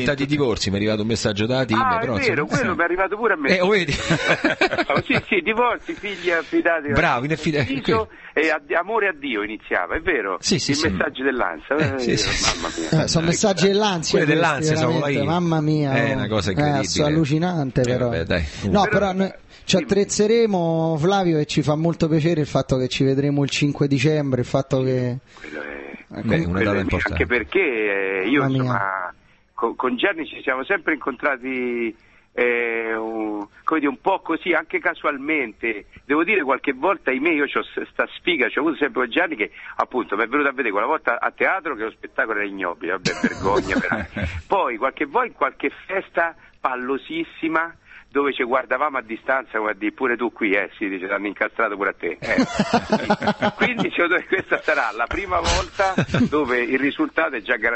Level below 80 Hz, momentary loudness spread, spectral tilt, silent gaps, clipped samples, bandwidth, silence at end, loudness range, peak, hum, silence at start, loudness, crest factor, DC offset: -42 dBFS; 7 LU; -5 dB/octave; none; under 0.1%; 8.6 kHz; 0 s; 4 LU; -2 dBFS; none; 0 s; -21 LUFS; 20 dB; under 0.1%